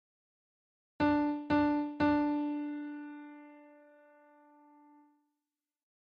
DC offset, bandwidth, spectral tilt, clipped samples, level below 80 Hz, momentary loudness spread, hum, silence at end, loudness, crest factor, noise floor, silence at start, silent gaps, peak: under 0.1%; 5.2 kHz; -5 dB/octave; under 0.1%; -64 dBFS; 19 LU; none; 2.4 s; -32 LUFS; 16 dB; under -90 dBFS; 1 s; none; -18 dBFS